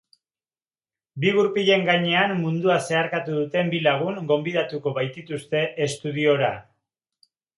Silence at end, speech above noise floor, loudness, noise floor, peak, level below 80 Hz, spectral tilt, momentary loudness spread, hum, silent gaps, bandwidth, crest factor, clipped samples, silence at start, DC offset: 0.95 s; over 68 dB; -22 LUFS; under -90 dBFS; -4 dBFS; -68 dBFS; -5.5 dB/octave; 8 LU; none; none; 11.5 kHz; 20 dB; under 0.1%; 1.15 s; under 0.1%